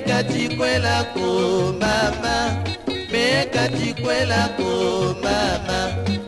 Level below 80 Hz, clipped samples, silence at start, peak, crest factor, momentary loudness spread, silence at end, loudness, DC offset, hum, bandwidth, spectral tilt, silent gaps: -40 dBFS; under 0.1%; 0 s; -6 dBFS; 16 dB; 5 LU; 0 s; -21 LUFS; under 0.1%; none; 11.5 kHz; -4.5 dB/octave; none